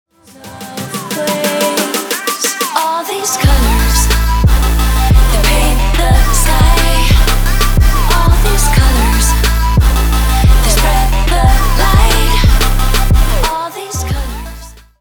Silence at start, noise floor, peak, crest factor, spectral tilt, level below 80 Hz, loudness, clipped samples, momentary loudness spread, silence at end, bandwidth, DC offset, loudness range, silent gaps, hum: 0.45 s; -34 dBFS; 0 dBFS; 10 dB; -4 dB/octave; -12 dBFS; -12 LUFS; under 0.1%; 9 LU; 0.3 s; over 20 kHz; under 0.1%; 2 LU; none; none